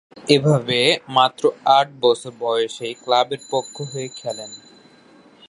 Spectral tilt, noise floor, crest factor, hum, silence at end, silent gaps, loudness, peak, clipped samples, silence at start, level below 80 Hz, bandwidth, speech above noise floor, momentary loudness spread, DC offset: -4.5 dB/octave; -50 dBFS; 20 dB; none; 0.9 s; none; -19 LUFS; 0 dBFS; under 0.1%; 0.15 s; -66 dBFS; 11.5 kHz; 30 dB; 13 LU; under 0.1%